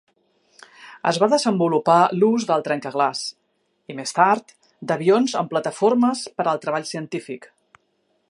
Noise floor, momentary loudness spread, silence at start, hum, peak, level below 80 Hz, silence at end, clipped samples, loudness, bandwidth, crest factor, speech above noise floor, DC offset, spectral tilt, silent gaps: -68 dBFS; 14 LU; 0.8 s; none; -2 dBFS; -74 dBFS; 0.85 s; under 0.1%; -20 LUFS; 11.5 kHz; 20 dB; 48 dB; under 0.1%; -5 dB/octave; none